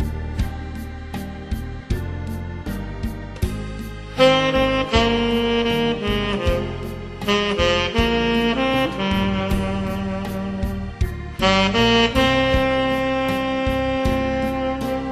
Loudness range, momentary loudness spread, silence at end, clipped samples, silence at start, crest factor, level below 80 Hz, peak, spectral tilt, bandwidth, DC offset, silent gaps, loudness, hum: 10 LU; 14 LU; 0 s; under 0.1%; 0 s; 18 dB; -32 dBFS; -2 dBFS; -5.5 dB/octave; 14 kHz; 0.1%; none; -21 LUFS; none